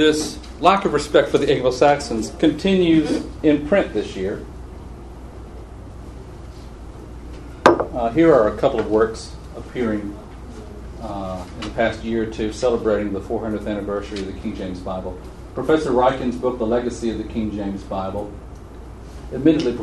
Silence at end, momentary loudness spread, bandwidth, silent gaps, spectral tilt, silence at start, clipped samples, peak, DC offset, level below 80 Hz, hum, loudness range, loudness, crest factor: 0 s; 22 LU; 12 kHz; none; -6 dB/octave; 0 s; under 0.1%; 0 dBFS; under 0.1%; -38 dBFS; none; 8 LU; -20 LUFS; 20 dB